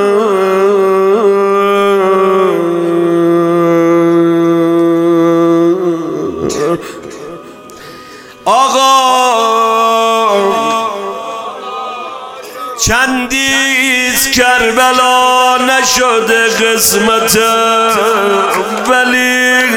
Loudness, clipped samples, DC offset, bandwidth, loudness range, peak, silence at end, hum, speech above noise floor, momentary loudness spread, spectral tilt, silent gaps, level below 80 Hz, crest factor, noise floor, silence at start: -10 LUFS; under 0.1%; under 0.1%; 17 kHz; 6 LU; 0 dBFS; 0 s; none; 22 dB; 13 LU; -3 dB/octave; none; -42 dBFS; 10 dB; -32 dBFS; 0 s